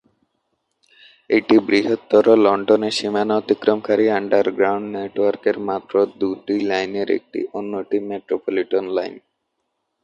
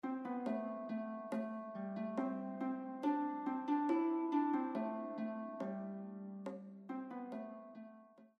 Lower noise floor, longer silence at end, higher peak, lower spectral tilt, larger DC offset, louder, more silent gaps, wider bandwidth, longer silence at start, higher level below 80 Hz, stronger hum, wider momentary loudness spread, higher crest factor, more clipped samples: first, -74 dBFS vs -61 dBFS; first, 0.85 s vs 0.1 s; first, -2 dBFS vs -24 dBFS; second, -5.5 dB/octave vs -8.5 dB/octave; neither; first, -19 LUFS vs -41 LUFS; neither; first, 10.5 kHz vs 8.2 kHz; first, 1.3 s vs 0.05 s; first, -64 dBFS vs under -90 dBFS; neither; second, 10 LU vs 13 LU; about the same, 18 dB vs 16 dB; neither